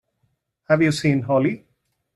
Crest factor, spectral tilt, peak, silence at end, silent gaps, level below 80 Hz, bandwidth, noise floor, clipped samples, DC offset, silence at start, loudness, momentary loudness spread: 18 dB; -6.5 dB/octave; -4 dBFS; 0.6 s; none; -58 dBFS; 12.5 kHz; -70 dBFS; under 0.1%; under 0.1%; 0.7 s; -20 LUFS; 6 LU